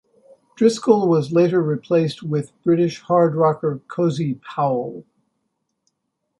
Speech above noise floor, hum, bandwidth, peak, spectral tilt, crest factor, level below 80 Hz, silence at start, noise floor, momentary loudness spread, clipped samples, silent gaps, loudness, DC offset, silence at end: 57 dB; none; 11.5 kHz; -2 dBFS; -7.5 dB/octave; 18 dB; -64 dBFS; 0.6 s; -76 dBFS; 9 LU; under 0.1%; none; -19 LUFS; under 0.1%; 1.4 s